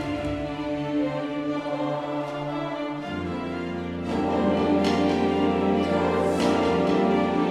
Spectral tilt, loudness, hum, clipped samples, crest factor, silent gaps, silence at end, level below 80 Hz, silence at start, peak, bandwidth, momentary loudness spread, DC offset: -6.5 dB/octave; -25 LUFS; none; under 0.1%; 14 dB; none; 0 s; -50 dBFS; 0 s; -10 dBFS; 12 kHz; 8 LU; under 0.1%